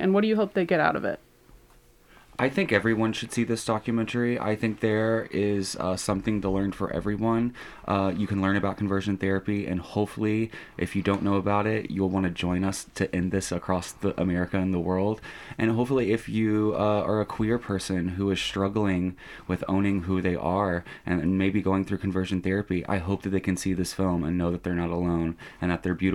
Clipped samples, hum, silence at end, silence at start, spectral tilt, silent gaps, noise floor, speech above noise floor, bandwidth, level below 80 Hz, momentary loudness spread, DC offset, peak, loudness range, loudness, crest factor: under 0.1%; none; 0 s; 0 s; -6 dB/octave; none; -56 dBFS; 30 dB; 14 kHz; -50 dBFS; 6 LU; under 0.1%; -6 dBFS; 2 LU; -27 LUFS; 20 dB